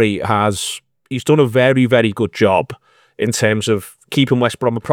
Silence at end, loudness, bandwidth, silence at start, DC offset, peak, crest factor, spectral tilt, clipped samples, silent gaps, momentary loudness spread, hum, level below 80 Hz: 0 s; -16 LUFS; 18 kHz; 0 s; under 0.1%; 0 dBFS; 16 dB; -5.5 dB/octave; under 0.1%; none; 10 LU; none; -56 dBFS